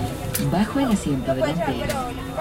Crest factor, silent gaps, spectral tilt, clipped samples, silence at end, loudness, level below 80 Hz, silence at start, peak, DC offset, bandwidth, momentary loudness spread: 14 dB; none; -5.5 dB/octave; under 0.1%; 0 s; -23 LUFS; -38 dBFS; 0 s; -8 dBFS; under 0.1%; 16.5 kHz; 5 LU